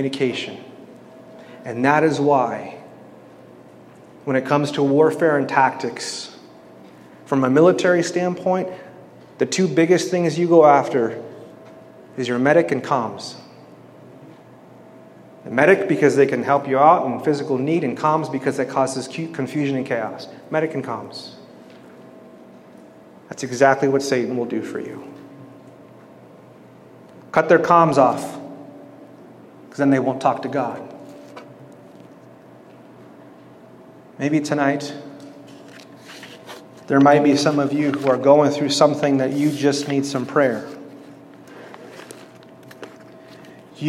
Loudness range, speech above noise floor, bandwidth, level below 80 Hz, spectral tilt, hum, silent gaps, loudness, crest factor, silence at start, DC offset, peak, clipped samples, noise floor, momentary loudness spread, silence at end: 9 LU; 27 dB; 13.5 kHz; -72 dBFS; -5.5 dB/octave; none; none; -19 LUFS; 20 dB; 0 s; under 0.1%; -2 dBFS; under 0.1%; -45 dBFS; 24 LU; 0 s